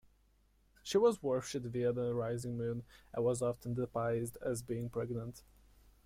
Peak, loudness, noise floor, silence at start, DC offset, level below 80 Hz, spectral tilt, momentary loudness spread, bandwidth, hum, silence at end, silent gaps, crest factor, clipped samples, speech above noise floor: -20 dBFS; -37 LUFS; -71 dBFS; 0.85 s; under 0.1%; -64 dBFS; -6 dB/octave; 11 LU; 16 kHz; none; 0.65 s; none; 18 dB; under 0.1%; 35 dB